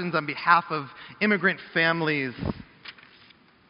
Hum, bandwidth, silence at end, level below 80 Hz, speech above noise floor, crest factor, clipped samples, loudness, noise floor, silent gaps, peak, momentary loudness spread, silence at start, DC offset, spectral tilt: none; 5.6 kHz; 0.8 s; -54 dBFS; 31 dB; 22 dB; under 0.1%; -24 LUFS; -56 dBFS; none; -4 dBFS; 20 LU; 0 s; under 0.1%; -3 dB/octave